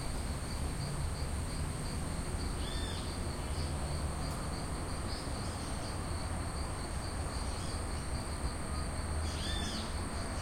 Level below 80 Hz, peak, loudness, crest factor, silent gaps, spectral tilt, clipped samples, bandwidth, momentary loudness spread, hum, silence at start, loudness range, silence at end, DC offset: -42 dBFS; -22 dBFS; -38 LUFS; 14 dB; none; -4.5 dB/octave; under 0.1%; 16.5 kHz; 2 LU; none; 0 s; 1 LU; 0 s; under 0.1%